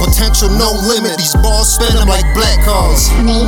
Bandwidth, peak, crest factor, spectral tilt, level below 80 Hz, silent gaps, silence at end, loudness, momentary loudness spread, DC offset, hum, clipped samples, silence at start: 19 kHz; 0 dBFS; 10 dB; -3.5 dB/octave; -12 dBFS; none; 0 s; -11 LUFS; 2 LU; under 0.1%; none; under 0.1%; 0 s